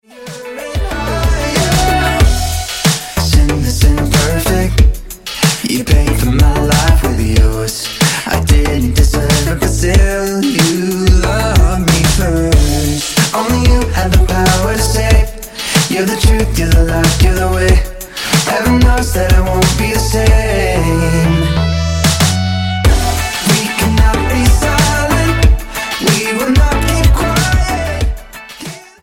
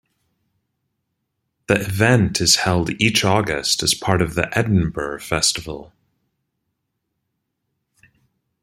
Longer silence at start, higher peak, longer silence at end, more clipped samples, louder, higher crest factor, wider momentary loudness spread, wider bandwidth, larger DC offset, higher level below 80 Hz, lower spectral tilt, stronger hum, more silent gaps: second, 0.15 s vs 1.7 s; about the same, 0 dBFS vs 0 dBFS; second, 0.2 s vs 2.8 s; neither; first, -12 LUFS vs -18 LUFS; second, 12 dB vs 20 dB; second, 6 LU vs 9 LU; about the same, 17 kHz vs 16 kHz; neither; first, -14 dBFS vs -46 dBFS; about the same, -4.5 dB/octave vs -3.5 dB/octave; neither; neither